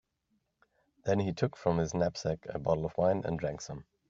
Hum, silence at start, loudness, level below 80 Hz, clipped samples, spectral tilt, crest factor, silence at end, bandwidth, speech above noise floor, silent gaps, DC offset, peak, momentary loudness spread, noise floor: none; 1.05 s; -32 LUFS; -58 dBFS; under 0.1%; -6.5 dB/octave; 20 dB; 0.25 s; 7.8 kHz; 46 dB; none; under 0.1%; -14 dBFS; 8 LU; -78 dBFS